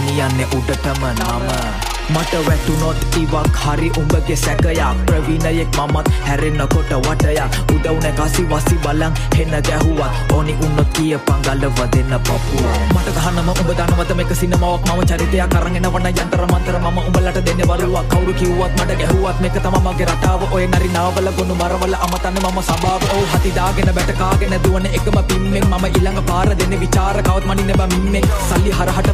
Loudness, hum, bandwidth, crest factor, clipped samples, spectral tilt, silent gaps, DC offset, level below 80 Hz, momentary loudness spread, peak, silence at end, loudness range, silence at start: -16 LUFS; none; 15.5 kHz; 14 dB; under 0.1%; -5.5 dB/octave; none; under 0.1%; -20 dBFS; 2 LU; 0 dBFS; 0 s; 1 LU; 0 s